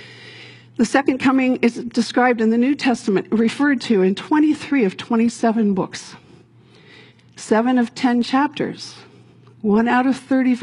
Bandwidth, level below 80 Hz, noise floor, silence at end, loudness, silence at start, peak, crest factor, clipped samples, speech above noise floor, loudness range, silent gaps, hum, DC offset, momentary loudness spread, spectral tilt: 11 kHz; -62 dBFS; -49 dBFS; 0 s; -18 LUFS; 0 s; -4 dBFS; 16 dB; under 0.1%; 31 dB; 4 LU; none; none; under 0.1%; 13 LU; -5.5 dB/octave